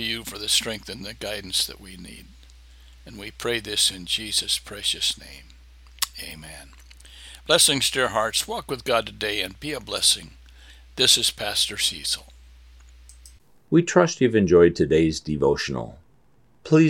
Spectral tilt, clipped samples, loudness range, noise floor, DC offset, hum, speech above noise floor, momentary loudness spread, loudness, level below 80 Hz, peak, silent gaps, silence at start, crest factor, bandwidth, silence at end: -3 dB/octave; under 0.1%; 6 LU; -61 dBFS; under 0.1%; none; 37 dB; 21 LU; -22 LUFS; -48 dBFS; -2 dBFS; none; 0 s; 22 dB; 17 kHz; 0 s